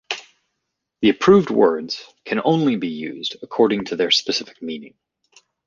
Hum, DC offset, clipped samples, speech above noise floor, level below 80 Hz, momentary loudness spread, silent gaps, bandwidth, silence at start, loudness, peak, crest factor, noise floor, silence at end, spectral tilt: none; under 0.1%; under 0.1%; 59 dB; -60 dBFS; 16 LU; none; 7.4 kHz; 0.1 s; -19 LUFS; -2 dBFS; 18 dB; -78 dBFS; 0.8 s; -5 dB/octave